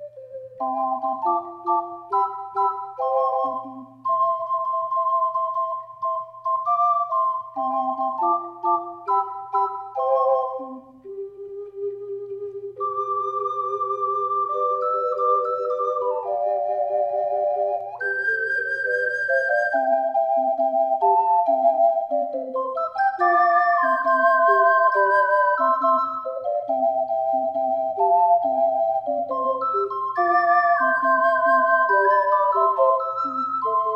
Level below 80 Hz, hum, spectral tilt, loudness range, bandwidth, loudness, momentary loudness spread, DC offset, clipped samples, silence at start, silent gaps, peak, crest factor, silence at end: -74 dBFS; none; -5.5 dB/octave; 7 LU; 6.4 kHz; -22 LUFS; 10 LU; under 0.1%; under 0.1%; 0 s; none; -6 dBFS; 14 dB; 0 s